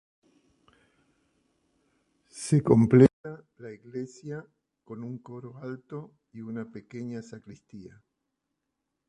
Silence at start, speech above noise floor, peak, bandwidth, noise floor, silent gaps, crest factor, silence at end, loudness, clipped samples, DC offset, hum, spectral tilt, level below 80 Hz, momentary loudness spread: 2.35 s; 56 dB; -4 dBFS; 11 kHz; -83 dBFS; 3.13-3.24 s; 26 dB; 1.2 s; -25 LUFS; under 0.1%; under 0.1%; none; -8 dB/octave; -60 dBFS; 27 LU